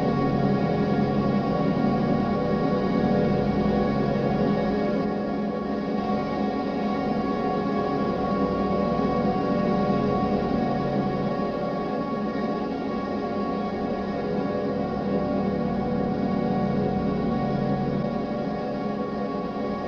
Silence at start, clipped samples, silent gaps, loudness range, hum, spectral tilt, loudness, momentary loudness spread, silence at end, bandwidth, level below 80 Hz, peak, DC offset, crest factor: 0 s; under 0.1%; none; 4 LU; none; -9 dB/octave; -25 LUFS; 5 LU; 0 s; 6.6 kHz; -44 dBFS; -10 dBFS; under 0.1%; 14 dB